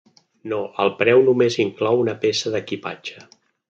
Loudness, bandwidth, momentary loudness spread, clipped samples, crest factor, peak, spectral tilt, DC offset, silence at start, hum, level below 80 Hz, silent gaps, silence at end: -20 LUFS; 7.8 kHz; 16 LU; under 0.1%; 18 dB; -2 dBFS; -5 dB/octave; under 0.1%; 0.45 s; none; -64 dBFS; none; 0.5 s